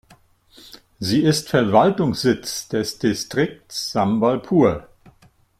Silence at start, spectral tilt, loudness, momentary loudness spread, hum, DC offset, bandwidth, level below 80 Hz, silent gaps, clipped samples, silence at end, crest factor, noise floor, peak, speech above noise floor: 0.75 s; -5.5 dB/octave; -20 LUFS; 9 LU; none; under 0.1%; 16 kHz; -52 dBFS; none; under 0.1%; 0.8 s; 20 dB; -55 dBFS; -2 dBFS; 36 dB